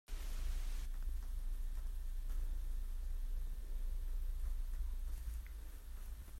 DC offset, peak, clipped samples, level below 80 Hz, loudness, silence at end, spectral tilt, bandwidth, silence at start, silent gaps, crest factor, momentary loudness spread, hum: under 0.1%; -30 dBFS; under 0.1%; -40 dBFS; -48 LUFS; 0 s; -4.5 dB/octave; 15 kHz; 0.1 s; none; 10 dB; 4 LU; none